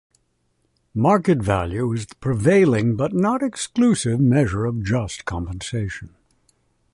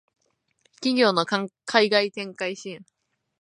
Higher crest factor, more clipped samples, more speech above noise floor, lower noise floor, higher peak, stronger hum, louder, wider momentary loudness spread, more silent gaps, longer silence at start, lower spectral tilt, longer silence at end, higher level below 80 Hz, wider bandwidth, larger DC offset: second, 16 dB vs 24 dB; neither; about the same, 48 dB vs 45 dB; about the same, -68 dBFS vs -68 dBFS; about the same, -4 dBFS vs -2 dBFS; neither; first, -20 LUFS vs -23 LUFS; second, 11 LU vs 16 LU; neither; first, 0.95 s vs 0.8 s; first, -6.5 dB/octave vs -4 dB/octave; first, 0.85 s vs 0.65 s; first, -42 dBFS vs -80 dBFS; about the same, 11.5 kHz vs 11 kHz; neither